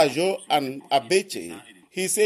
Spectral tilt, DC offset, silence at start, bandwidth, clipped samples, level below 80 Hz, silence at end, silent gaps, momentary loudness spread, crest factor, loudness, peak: -3 dB/octave; under 0.1%; 0 s; 14.5 kHz; under 0.1%; -72 dBFS; 0 s; none; 15 LU; 18 dB; -24 LUFS; -6 dBFS